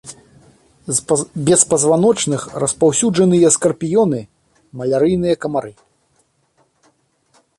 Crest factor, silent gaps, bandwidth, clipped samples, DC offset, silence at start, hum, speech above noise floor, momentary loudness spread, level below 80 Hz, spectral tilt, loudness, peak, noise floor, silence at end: 18 dB; none; 12 kHz; under 0.1%; under 0.1%; 0.05 s; none; 46 dB; 12 LU; -52 dBFS; -4.5 dB/octave; -15 LUFS; 0 dBFS; -61 dBFS; 1.9 s